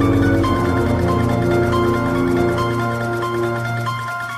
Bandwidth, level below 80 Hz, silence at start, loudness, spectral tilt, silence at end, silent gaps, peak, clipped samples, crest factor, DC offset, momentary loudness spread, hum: 15 kHz; -34 dBFS; 0 s; -18 LUFS; -7 dB/octave; 0 s; none; -4 dBFS; under 0.1%; 14 dB; under 0.1%; 5 LU; none